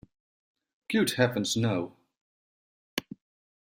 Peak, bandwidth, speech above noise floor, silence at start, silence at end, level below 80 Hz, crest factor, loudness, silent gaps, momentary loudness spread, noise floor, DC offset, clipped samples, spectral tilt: -10 dBFS; 16 kHz; over 63 dB; 0.9 s; 0.6 s; -66 dBFS; 22 dB; -29 LUFS; 2.17-2.97 s; 17 LU; under -90 dBFS; under 0.1%; under 0.1%; -4.5 dB/octave